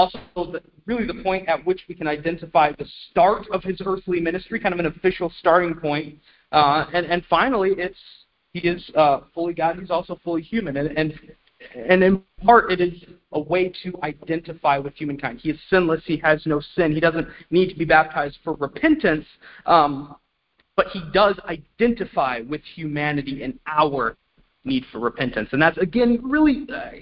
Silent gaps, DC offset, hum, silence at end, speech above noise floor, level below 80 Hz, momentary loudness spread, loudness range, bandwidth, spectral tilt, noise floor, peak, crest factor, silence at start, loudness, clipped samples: none; under 0.1%; none; 0 s; 46 dB; -48 dBFS; 12 LU; 3 LU; 5.6 kHz; -10.5 dB/octave; -67 dBFS; 0 dBFS; 22 dB; 0 s; -21 LUFS; under 0.1%